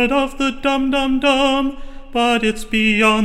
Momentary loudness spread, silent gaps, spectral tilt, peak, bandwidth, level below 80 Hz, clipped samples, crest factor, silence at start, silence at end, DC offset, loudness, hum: 6 LU; none; -4 dB/octave; -2 dBFS; 13.5 kHz; -34 dBFS; under 0.1%; 16 dB; 0 s; 0 s; under 0.1%; -17 LUFS; none